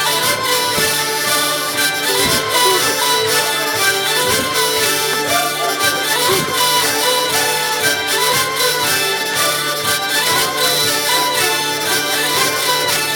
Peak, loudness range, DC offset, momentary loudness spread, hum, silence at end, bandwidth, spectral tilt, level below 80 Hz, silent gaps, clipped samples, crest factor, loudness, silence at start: 0 dBFS; 1 LU; under 0.1%; 2 LU; none; 0 s; over 20 kHz; -1 dB/octave; -52 dBFS; none; under 0.1%; 16 dB; -14 LUFS; 0 s